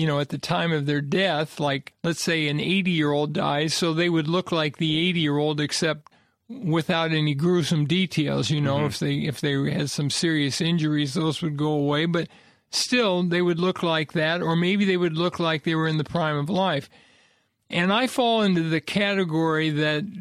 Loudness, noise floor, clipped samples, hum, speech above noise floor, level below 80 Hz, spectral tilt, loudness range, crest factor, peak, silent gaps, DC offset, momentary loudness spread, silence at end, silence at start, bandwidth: -23 LUFS; -63 dBFS; under 0.1%; none; 40 dB; -60 dBFS; -5 dB/octave; 1 LU; 14 dB; -8 dBFS; none; under 0.1%; 4 LU; 0 s; 0 s; 14.5 kHz